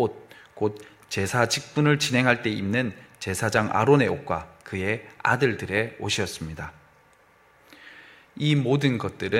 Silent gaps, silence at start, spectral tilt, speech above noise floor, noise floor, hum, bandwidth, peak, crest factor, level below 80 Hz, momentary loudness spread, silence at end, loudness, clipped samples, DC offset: none; 0 s; -5 dB/octave; 34 dB; -58 dBFS; none; 16 kHz; -2 dBFS; 22 dB; -56 dBFS; 14 LU; 0 s; -24 LUFS; under 0.1%; under 0.1%